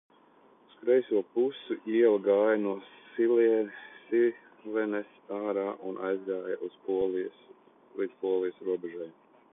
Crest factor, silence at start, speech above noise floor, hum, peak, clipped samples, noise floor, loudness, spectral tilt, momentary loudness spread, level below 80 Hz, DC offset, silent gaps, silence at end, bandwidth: 18 dB; 0.8 s; 32 dB; none; -12 dBFS; under 0.1%; -61 dBFS; -30 LUFS; -9.5 dB/octave; 15 LU; -76 dBFS; under 0.1%; none; 0.45 s; 3.8 kHz